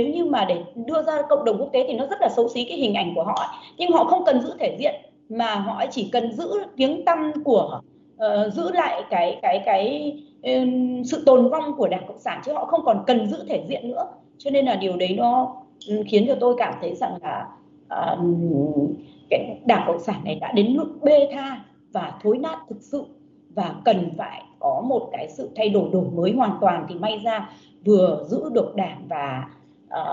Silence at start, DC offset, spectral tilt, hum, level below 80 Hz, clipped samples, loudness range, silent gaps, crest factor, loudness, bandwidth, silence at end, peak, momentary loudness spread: 0 s; under 0.1%; -6.5 dB/octave; none; -70 dBFS; under 0.1%; 3 LU; none; 20 dB; -22 LUFS; 7.6 kHz; 0 s; -4 dBFS; 13 LU